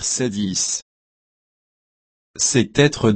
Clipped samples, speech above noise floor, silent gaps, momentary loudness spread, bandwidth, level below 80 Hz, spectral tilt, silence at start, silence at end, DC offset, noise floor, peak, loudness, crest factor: under 0.1%; over 71 dB; 0.82-2.34 s; 8 LU; 8.8 kHz; -50 dBFS; -3.5 dB/octave; 0 s; 0 s; under 0.1%; under -90 dBFS; -2 dBFS; -19 LUFS; 20 dB